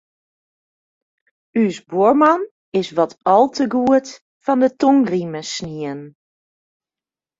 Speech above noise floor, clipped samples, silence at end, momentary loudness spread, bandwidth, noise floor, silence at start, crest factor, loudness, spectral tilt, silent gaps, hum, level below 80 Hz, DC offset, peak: over 73 dB; under 0.1%; 1.3 s; 13 LU; 7.8 kHz; under -90 dBFS; 1.55 s; 18 dB; -18 LUFS; -5.5 dB/octave; 2.51-2.72 s, 4.21-4.40 s; none; -62 dBFS; under 0.1%; -2 dBFS